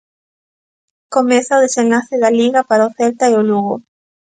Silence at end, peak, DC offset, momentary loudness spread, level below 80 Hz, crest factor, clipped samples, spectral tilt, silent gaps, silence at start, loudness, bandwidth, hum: 0.5 s; 0 dBFS; under 0.1%; 6 LU; -66 dBFS; 14 dB; under 0.1%; -4.5 dB/octave; none; 1.1 s; -14 LUFS; 9.4 kHz; none